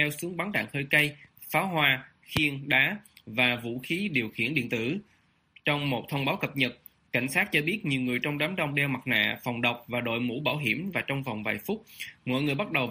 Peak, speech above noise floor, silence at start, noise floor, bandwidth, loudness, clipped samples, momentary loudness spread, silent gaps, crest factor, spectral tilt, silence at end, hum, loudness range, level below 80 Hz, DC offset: -6 dBFS; 33 dB; 0 s; -61 dBFS; 15.5 kHz; -28 LUFS; under 0.1%; 9 LU; none; 24 dB; -5 dB/octave; 0 s; none; 4 LU; -62 dBFS; under 0.1%